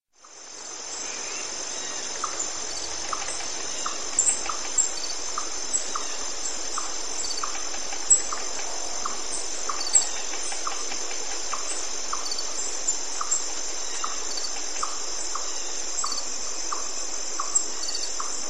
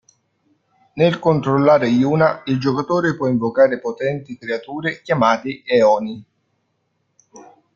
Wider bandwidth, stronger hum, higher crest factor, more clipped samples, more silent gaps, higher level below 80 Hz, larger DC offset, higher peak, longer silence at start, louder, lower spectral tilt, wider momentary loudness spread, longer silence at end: first, 15.5 kHz vs 7.2 kHz; neither; first, 24 dB vs 18 dB; neither; neither; about the same, -56 dBFS vs -58 dBFS; first, 4% vs under 0.1%; second, -6 dBFS vs -2 dBFS; second, 0 s vs 0.95 s; second, -27 LUFS vs -18 LUFS; second, 1 dB/octave vs -7 dB/octave; second, 8 LU vs 11 LU; second, 0 s vs 0.35 s